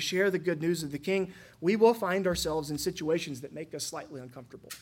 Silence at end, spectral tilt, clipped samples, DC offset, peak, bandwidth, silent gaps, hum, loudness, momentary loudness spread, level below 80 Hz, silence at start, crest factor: 0 s; -4.5 dB/octave; under 0.1%; under 0.1%; -10 dBFS; 17 kHz; none; none; -30 LUFS; 19 LU; -58 dBFS; 0 s; 20 dB